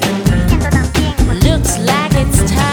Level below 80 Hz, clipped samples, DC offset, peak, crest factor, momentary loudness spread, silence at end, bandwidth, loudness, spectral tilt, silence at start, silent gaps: -18 dBFS; under 0.1%; under 0.1%; 0 dBFS; 12 dB; 2 LU; 0 s; over 20 kHz; -13 LUFS; -5 dB/octave; 0 s; none